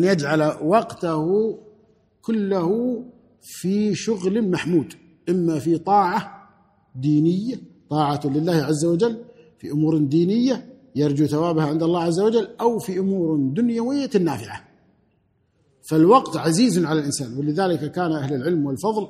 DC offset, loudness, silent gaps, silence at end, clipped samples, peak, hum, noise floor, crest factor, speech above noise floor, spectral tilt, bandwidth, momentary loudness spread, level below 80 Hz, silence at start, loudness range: under 0.1%; -21 LUFS; none; 0 s; under 0.1%; -2 dBFS; none; -65 dBFS; 18 dB; 45 dB; -6.5 dB/octave; 14.5 kHz; 10 LU; -62 dBFS; 0 s; 3 LU